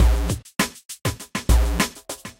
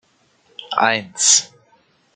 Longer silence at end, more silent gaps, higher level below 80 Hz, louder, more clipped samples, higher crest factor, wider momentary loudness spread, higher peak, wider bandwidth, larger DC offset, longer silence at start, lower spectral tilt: second, 0.1 s vs 0.7 s; first, 0.85-0.89 s vs none; first, -24 dBFS vs -72 dBFS; second, -24 LUFS vs -15 LUFS; neither; second, 16 dB vs 22 dB; about the same, 8 LU vs 6 LU; second, -6 dBFS vs 0 dBFS; first, 16.5 kHz vs 11 kHz; neither; second, 0 s vs 0.6 s; first, -4.5 dB/octave vs 0.5 dB/octave